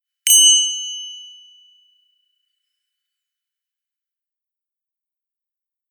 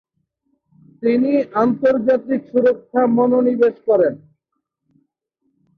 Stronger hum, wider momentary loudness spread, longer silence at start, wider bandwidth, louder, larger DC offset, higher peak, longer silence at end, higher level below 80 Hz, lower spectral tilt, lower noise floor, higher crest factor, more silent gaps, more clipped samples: neither; first, 24 LU vs 5 LU; second, 0.25 s vs 1 s; first, over 20 kHz vs 5 kHz; first, -11 LUFS vs -17 LUFS; neither; first, 0 dBFS vs -4 dBFS; first, 4.65 s vs 1.6 s; second, under -90 dBFS vs -64 dBFS; second, 14 dB/octave vs -9 dB/octave; first, -87 dBFS vs -76 dBFS; first, 22 dB vs 16 dB; neither; neither